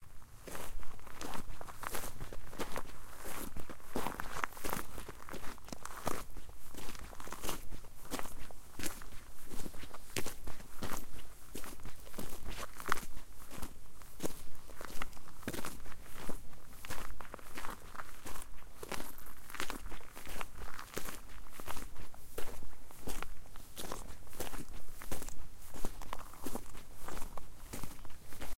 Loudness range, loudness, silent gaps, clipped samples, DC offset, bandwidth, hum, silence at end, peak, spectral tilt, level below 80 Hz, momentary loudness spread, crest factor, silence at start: 4 LU; -46 LUFS; none; under 0.1%; under 0.1%; 17 kHz; none; 0.05 s; -10 dBFS; -3.5 dB/octave; -48 dBFS; 11 LU; 22 dB; 0 s